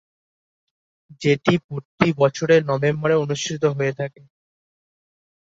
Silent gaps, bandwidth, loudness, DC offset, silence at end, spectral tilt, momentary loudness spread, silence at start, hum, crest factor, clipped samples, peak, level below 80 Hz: 1.64-1.69 s, 1.85-1.98 s; 7.8 kHz; -20 LUFS; under 0.1%; 1.35 s; -6 dB/octave; 8 LU; 1.1 s; none; 20 dB; under 0.1%; -2 dBFS; -58 dBFS